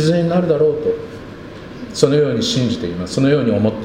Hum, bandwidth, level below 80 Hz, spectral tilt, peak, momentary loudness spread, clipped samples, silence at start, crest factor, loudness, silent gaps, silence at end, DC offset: none; 11.5 kHz; -46 dBFS; -6 dB/octave; 0 dBFS; 18 LU; under 0.1%; 0 s; 16 dB; -17 LUFS; none; 0 s; under 0.1%